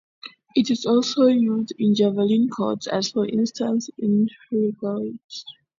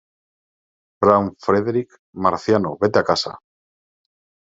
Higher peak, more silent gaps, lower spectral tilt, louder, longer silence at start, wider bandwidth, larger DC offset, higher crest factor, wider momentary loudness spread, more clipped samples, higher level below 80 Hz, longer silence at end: second, -6 dBFS vs 0 dBFS; second, 5.24-5.29 s vs 1.99-2.13 s; about the same, -6 dB/octave vs -6 dB/octave; second, -22 LUFS vs -19 LUFS; second, 0.25 s vs 1 s; about the same, 7.6 kHz vs 7.8 kHz; neither; about the same, 16 dB vs 20 dB; first, 13 LU vs 8 LU; neither; second, -68 dBFS vs -60 dBFS; second, 0.3 s vs 1.1 s